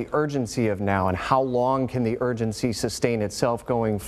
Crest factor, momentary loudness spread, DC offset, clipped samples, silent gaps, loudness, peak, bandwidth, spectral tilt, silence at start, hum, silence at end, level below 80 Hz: 20 dB; 4 LU; under 0.1%; under 0.1%; none; -24 LUFS; -4 dBFS; 15 kHz; -6 dB/octave; 0 s; none; 0 s; -50 dBFS